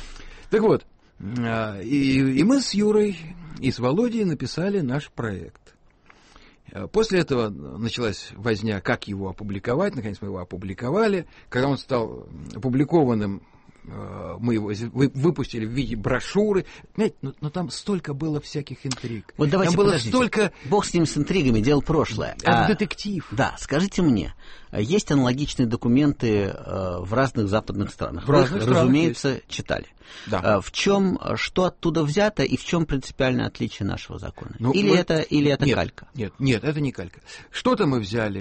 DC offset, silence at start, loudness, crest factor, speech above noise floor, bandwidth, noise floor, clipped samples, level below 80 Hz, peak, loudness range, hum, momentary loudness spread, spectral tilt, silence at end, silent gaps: under 0.1%; 0 s; -23 LUFS; 18 dB; 32 dB; 8.8 kHz; -54 dBFS; under 0.1%; -44 dBFS; -4 dBFS; 5 LU; none; 13 LU; -6 dB/octave; 0 s; none